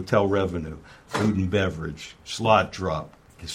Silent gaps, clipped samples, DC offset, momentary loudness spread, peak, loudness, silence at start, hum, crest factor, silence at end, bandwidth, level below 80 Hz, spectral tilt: none; under 0.1%; under 0.1%; 18 LU; -4 dBFS; -25 LUFS; 0 s; none; 22 dB; 0 s; 15 kHz; -48 dBFS; -6 dB/octave